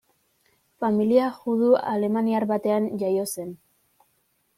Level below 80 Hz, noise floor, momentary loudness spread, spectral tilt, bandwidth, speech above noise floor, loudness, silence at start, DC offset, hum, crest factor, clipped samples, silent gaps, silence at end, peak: -70 dBFS; -69 dBFS; 9 LU; -6.5 dB/octave; 15.5 kHz; 47 dB; -23 LUFS; 0.8 s; under 0.1%; none; 18 dB; under 0.1%; none; 1.05 s; -6 dBFS